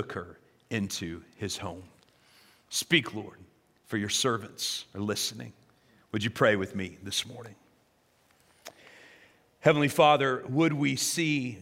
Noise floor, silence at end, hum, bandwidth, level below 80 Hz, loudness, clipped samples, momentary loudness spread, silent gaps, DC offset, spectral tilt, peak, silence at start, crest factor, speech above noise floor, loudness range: -67 dBFS; 0 s; none; 16 kHz; -70 dBFS; -28 LUFS; under 0.1%; 23 LU; none; under 0.1%; -4 dB/octave; -6 dBFS; 0 s; 24 dB; 38 dB; 6 LU